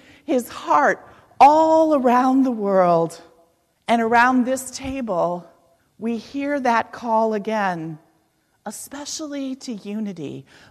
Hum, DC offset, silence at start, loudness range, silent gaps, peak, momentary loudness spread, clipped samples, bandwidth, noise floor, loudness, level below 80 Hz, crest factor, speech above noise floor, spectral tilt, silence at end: none; under 0.1%; 0.3 s; 9 LU; none; -2 dBFS; 17 LU; under 0.1%; 14 kHz; -64 dBFS; -20 LUFS; -58 dBFS; 18 dB; 45 dB; -5 dB/octave; 0.3 s